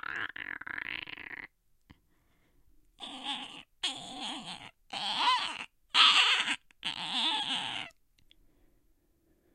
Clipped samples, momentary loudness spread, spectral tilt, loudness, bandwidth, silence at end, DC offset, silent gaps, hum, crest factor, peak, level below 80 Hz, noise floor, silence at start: under 0.1%; 21 LU; 0 dB/octave; -29 LUFS; 16.5 kHz; 1.65 s; under 0.1%; none; none; 26 dB; -8 dBFS; -70 dBFS; -70 dBFS; 0.05 s